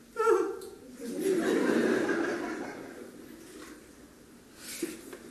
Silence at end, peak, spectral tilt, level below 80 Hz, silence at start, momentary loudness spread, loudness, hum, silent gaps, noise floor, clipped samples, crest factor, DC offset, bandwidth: 0 s; -14 dBFS; -4.5 dB/octave; -68 dBFS; 0 s; 21 LU; -30 LUFS; none; none; -54 dBFS; under 0.1%; 18 dB; under 0.1%; 13 kHz